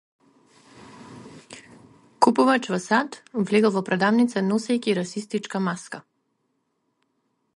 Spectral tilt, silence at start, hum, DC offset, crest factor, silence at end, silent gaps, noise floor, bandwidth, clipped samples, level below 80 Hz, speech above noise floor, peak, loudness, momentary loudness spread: -5.5 dB/octave; 1 s; none; under 0.1%; 24 dB; 1.55 s; none; -73 dBFS; 11.5 kHz; under 0.1%; -70 dBFS; 51 dB; -2 dBFS; -23 LUFS; 24 LU